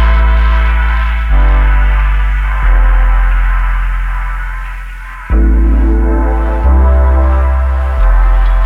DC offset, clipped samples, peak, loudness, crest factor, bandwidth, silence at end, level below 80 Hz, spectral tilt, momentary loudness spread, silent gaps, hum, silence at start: under 0.1%; under 0.1%; 0 dBFS; -12 LUFS; 8 dB; 3.9 kHz; 0 s; -8 dBFS; -8 dB/octave; 9 LU; none; none; 0 s